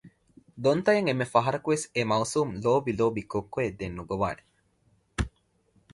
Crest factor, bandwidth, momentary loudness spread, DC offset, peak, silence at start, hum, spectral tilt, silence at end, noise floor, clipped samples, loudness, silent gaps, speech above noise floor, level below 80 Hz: 20 dB; 11.5 kHz; 10 LU; under 0.1%; -8 dBFS; 0.05 s; none; -5.5 dB/octave; 0.65 s; -67 dBFS; under 0.1%; -28 LUFS; none; 41 dB; -48 dBFS